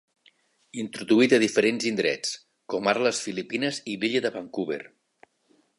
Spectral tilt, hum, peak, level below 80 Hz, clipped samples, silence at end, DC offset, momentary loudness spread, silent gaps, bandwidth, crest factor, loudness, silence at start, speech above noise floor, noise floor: -3.5 dB/octave; none; -6 dBFS; -74 dBFS; under 0.1%; 0.9 s; under 0.1%; 14 LU; none; 11.5 kHz; 20 dB; -25 LUFS; 0.75 s; 41 dB; -66 dBFS